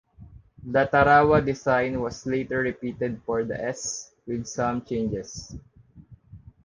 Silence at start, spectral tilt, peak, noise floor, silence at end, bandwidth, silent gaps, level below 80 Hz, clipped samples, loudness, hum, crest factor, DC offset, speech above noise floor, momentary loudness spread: 0.2 s; -5.5 dB/octave; -4 dBFS; -51 dBFS; 0.25 s; 10 kHz; none; -48 dBFS; under 0.1%; -25 LUFS; none; 20 dB; under 0.1%; 26 dB; 17 LU